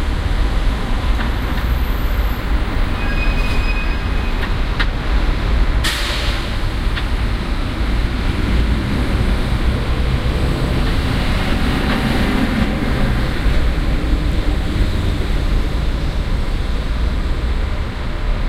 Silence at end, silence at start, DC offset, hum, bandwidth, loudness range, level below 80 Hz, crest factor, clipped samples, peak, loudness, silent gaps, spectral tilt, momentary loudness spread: 0 s; 0 s; under 0.1%; none; 15 kHz; 2 LU; -18 dBFS; 14 dB; under 0.1%; -2 dBFS; -20 LUFS; none; -6 dB/octave; 4 LU